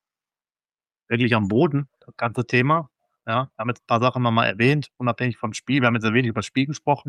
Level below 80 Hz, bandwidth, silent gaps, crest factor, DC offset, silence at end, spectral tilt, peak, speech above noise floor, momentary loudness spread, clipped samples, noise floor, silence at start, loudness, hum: -62 dBFS; 11 kHz; none; 18 dB; under 0.1%; 0 s; -6.5 dB/octave; -4 dBFS; over 68 dB; 9 LU; under 0.1%; under -90 dBFS; 1.1 s; -22 LUFS; none